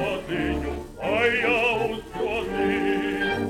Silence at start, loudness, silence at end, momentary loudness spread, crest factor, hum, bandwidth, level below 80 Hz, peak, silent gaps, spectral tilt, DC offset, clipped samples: 0 s; -24 LUFS; 0 s; 9 LU; 16 dB; none; 17 kHz; -42 dBFS; -8 dBFS; none; -5.5 dB/octave; under 0.1%; under 0.1%